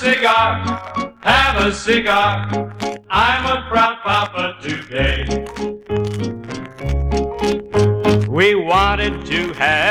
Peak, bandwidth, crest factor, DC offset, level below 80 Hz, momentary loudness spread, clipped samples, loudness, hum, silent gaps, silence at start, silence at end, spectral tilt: -2 dBFS; 15.5 kHz; 16 dB; under 0.1%; -30 dBFS; 12 LU; under 0.1%; -17 LUFS; none; none; 0 s; 0 s; -5 dB/octave